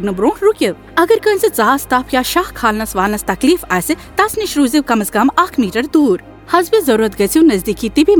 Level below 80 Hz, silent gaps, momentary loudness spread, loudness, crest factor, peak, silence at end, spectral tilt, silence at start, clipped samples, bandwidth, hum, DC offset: -38 dBFS; none; 4 LU; -14 LUFS; 14 dB; 0 dBFS; 0 s; -4 dB/octave; 0 s; under 0.1%; over 20 kHz; none; under 0.1%